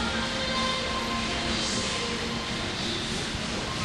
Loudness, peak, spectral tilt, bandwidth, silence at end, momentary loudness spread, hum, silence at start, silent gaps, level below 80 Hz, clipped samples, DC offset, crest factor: -28 LUFS; -14 dBFS; -3 dB/octave; 12.5 kHz; 0 s; 3 LU; none; 0 s; none; -44 dBFS; under 0.1%; under 0.1%; 16 dB